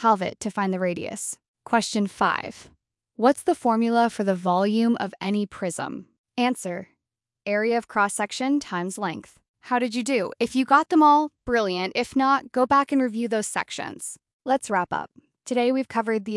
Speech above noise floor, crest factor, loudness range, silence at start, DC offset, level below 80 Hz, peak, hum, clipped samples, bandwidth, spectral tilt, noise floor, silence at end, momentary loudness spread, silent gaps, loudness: 62 dB; 20 dB; 6 LU; 0 s; under 0.1%; -62 dBFS; -4 dBFS; none; under 0.1%; 12 kHz; -4.5 dB/octave; -85 dBFS; 0 s; 12 LU; 1.48-1.54 s, 6.18-6.24 s, 9.49-9.54 s, 14.33-14.39 s; -24 LUFS